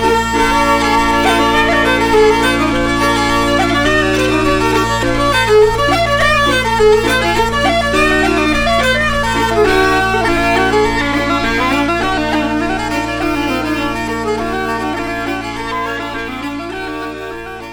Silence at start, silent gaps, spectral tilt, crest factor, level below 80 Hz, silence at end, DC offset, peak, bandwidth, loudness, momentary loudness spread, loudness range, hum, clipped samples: 0 s; none; -4.5 dB/octave; 12 dB; -28 dBFS; 0 s; under 0.1%; 0 dBFS; 19 kHz; -13 LUFS; 9 LU; 6 LU; none; under 0.1%